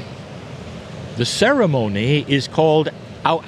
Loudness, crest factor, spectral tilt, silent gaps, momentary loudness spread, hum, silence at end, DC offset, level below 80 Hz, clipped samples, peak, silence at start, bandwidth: -18 LUFS; 18 dB; -5.5 dB/octave; none; 18 LU; none; 0 s; under 0.1%; -50 dBFS; under 0.1%; 0 dBFS; 0 s; 13 kHz